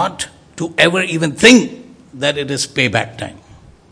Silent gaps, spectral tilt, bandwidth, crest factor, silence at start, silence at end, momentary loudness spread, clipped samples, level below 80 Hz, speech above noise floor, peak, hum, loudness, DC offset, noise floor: none; -3.5 dB/octave; 11 kHz; 16 dB; 0 s; 0.6 s; 18 LU; 0.5%; -50 dBFS; 29 dB; 0 dBFS; none; -13 LUFS; under 0.1%; -43 dBFS